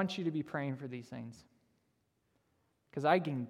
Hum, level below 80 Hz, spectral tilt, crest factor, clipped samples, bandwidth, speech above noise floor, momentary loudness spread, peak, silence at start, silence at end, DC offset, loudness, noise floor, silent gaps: none; -80 dBFS; -7 dB/octave; 24 dB; under 0.1%; 13 kHz; 43 dB; 17 LU; -14 dBFS; 0 s; 0 s; under 0.1%; -36 LUFS; -78 dBFS; none